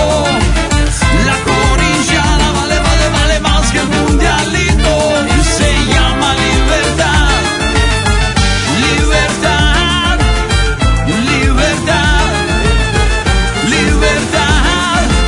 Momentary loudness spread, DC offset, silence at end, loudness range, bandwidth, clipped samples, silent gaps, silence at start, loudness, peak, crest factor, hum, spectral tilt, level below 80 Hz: 2 LU; under 0.1%; 0 s; 1 LU; 11 kHz; under 0.1%; none; 0 s; -11 LUFS; 0 dBFS; 10 dB; none; -4 dB/octave; -16 dBFS